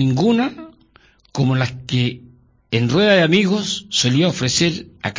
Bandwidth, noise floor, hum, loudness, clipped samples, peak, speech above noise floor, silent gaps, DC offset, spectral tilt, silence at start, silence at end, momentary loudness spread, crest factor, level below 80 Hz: 7.6 kHz; -53 dBFS; none; -17 LUFS; under 0.1%; -4 dBFS; 36 dB; none; under 0.1%; -5 dB/octave; 0 s; 0 s; 10 LU; 14 dB; -50 dBFS